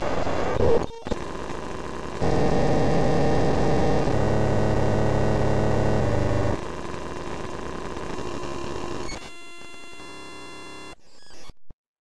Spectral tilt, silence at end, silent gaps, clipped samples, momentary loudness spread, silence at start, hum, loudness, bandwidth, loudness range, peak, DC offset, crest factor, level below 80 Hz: -6.5 dB/octave; 0 s; 11.73-11.95 s; under 0.1%; 17 LU; 0 s; none; -25 LUFS; 11.5 kHz; 13 LU; -8 dBFS; 3%; 16 dB; -36 dBFS